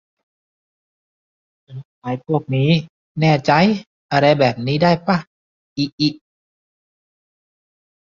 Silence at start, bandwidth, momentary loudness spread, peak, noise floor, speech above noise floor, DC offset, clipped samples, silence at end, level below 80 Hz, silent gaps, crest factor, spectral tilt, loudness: 1.7 s; 7.2 kHz; 18 LU; -2 dBFS; under -90 dBFS; over 74 dB; under 0.1%; under 0.1%; 2.05 s; -56 dBFS; 1.85-2.02 s, 2.89-3.15 s, 3.87-4.09 s, 5.27-5.76 s, 5.92-5.98 s; 20 dB; -7 dB/octave; -18 LUFS